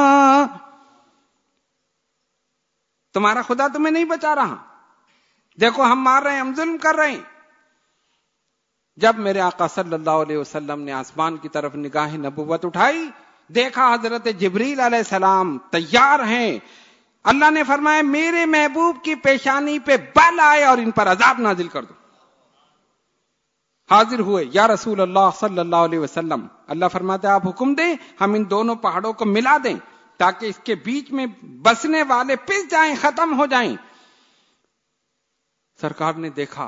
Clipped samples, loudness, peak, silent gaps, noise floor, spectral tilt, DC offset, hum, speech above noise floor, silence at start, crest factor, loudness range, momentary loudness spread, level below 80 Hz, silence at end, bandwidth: under 0.1%; -18 LUFS; 0 dBFS; none; -74 dBFS; -4.5 dB/octave; under 0.1%; none; 56 dB; 0 s; 18 dB; 7 LU; 12 LU; -62 dBFS; 0 s; 7.8 kHz